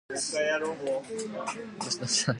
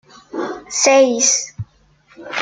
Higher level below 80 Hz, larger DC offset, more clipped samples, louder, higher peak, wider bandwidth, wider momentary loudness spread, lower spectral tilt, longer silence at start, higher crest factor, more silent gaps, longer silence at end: second, -70 dBFS vs -58 dBFS; neither; neither; second, -31 LUFS vs -15 LUFS; second, -12 dBFS vs -2 dBFS; first, 11.5 kHz vs 10 kHz; second, 9 LU vs 20 LU; about the same, -2.5 dB/octave vs -2 dB/octave; second, 0.1 s vs 0.35 s; about the same, 20 dB vs 16 dB; neither; about the same, 0 s vs 0 s